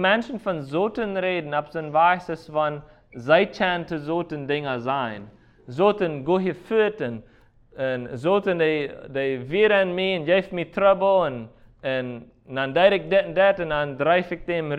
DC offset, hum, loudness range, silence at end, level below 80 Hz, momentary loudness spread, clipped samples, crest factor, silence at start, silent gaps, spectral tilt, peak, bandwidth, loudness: under 0.1%; none; 3 LU; 0 s; -54 dBFS; 11 LU; under 0.1%; 18 dB; 0 s; none; -7 dB/octave; -4 dBFS; 8.6 kHz; -23 LUFS